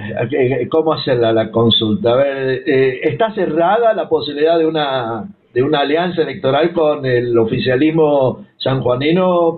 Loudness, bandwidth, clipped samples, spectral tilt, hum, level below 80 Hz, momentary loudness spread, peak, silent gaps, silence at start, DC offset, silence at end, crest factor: -15 LUFS; 4.5 kHz; under 0.1%; -10 dB/octave; none; -48 dBFS; 6 LU; -4 dBFS; none; 0 s; under 0.1%; 0 s; 12 dB